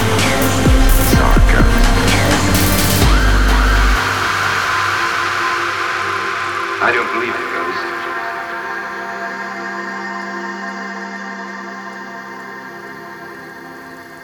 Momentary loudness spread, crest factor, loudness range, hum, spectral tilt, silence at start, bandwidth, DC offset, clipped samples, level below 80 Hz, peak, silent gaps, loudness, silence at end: 17 LU; 16 dB; 13 LU; none; -4 dB/octave; 0 s; over 20 kHz; under 0.1%; under 0.1%; -20 dBFS; 0 dBFS; none; -16 LUFS; 0 s